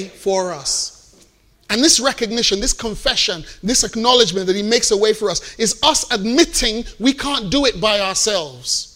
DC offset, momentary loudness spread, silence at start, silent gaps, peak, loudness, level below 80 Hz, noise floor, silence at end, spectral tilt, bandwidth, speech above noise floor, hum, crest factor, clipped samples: under 0.1%; 8 LU; 0 s; none; 0 dBFS; -16 LUFS; -36 dBFS; -53 dBFS; 0.05 s; -2 dB/octave; 16 kHz; 35 dB; none; 18 dB; under 0.1%